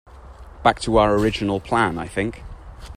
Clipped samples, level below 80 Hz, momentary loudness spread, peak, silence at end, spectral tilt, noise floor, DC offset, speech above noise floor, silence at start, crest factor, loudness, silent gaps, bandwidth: under 0.1%; -38 dBFS; 20 LU; -2 dBFS; 0 s; -5.5 dB/octave; -41 dBFS; under 0.1%; 21 dB; 0.15 s; 20 dB; -20 LUFS; none; 14.5 kHz